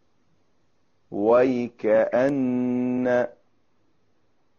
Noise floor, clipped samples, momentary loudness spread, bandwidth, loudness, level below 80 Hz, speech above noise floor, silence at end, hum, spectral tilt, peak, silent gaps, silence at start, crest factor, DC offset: -70 dBFS; under 0.1%; 7 LU; 6.8 kHz; -23 LUFS; -66 dBFS; 49 dB; 1.3 s; none; -6.5 dB/octave; -8 dBFS; none; 1.1 s; 16 dB; under 0.1%